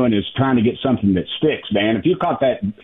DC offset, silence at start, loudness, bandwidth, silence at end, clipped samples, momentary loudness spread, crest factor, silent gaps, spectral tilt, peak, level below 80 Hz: under 0.1%; 0 s; -18 LUFS; 3.9 kHz; 0.1 s; under 0.1%; 3 LU; 12 dB; none; -10 dB/octave; -6 dBFS; -48 dBFS